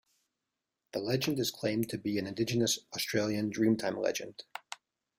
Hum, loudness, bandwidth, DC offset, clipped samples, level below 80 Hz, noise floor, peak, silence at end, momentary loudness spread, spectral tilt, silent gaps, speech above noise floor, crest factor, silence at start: none; -32 LUFS; 16.5 kHz; under 0.1%; under 0.1%; -68 dBFS; -88 dBFS; -16 dBFS; 0.45 s; 15 LU; -4.5 dB/octave; none; 56 dB; 18 dB; 0.95 s